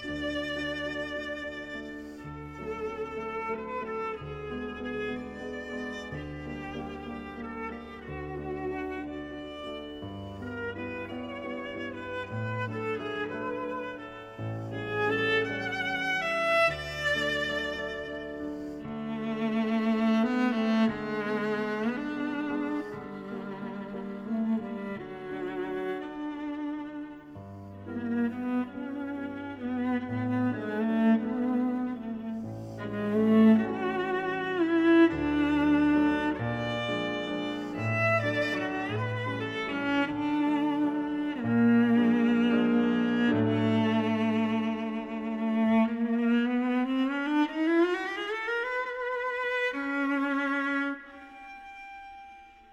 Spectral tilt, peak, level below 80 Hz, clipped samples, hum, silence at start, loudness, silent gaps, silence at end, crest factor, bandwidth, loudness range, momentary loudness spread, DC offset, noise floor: -6.5 dB/octave; -10 dBFS; -56 dBFS; under 0.1%; none; 0 s; -30 LUFS; none; 0.1 s; 20 dB; 9.2 kHz; 11 LU; 14 LU; under 0.1%; -51 dBFS